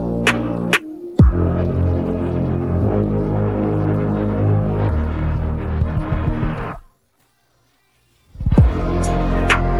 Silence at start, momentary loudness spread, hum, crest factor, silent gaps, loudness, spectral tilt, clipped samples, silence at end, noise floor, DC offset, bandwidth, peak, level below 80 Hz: 0 s; 7 LU; none; 16 dB; none; -19 LUFS; -7 dB/octave; under 0.1%; 0 s; -62 dBFS; under 0.1%; 13 kHz; -2 dBFS; -24 dBFS